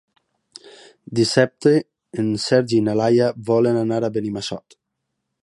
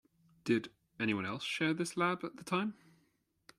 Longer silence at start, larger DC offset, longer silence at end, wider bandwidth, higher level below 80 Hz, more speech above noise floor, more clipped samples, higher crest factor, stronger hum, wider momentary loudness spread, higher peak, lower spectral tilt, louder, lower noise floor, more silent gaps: first, 0.65 s vs 0.45 s; neither; about the same, 0.85 s vs 0.85 s; second, 11.5 kHz vs 14 kHz; first, -60 dBFS vs -76 dBFS; first, 59 dB vs 41 dB; neither; about the same, 18 dB vs 18 dB; neither; about the same, 10 LU vs 8 LU; first, -2 dBFS vs -18 dBFS; about the same, -6 dB/octave vs -5 dB/octave; first, -19 LUFS vs -36 LUFS; about the same, -78 dBFS vs -76 dBFS; neither